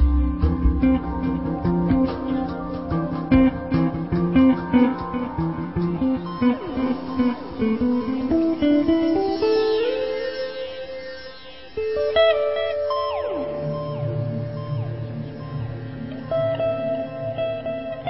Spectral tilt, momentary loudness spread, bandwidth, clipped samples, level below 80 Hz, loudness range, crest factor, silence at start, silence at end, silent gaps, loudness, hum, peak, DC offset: -12 dB/octave; 12 LU; 5.8 kHz; under 0.1%; -32 dBFS; 6 LU; 18 dB; 0 s; 0 s; none; -23 LUFS; none; -4 dBFS; 0.3%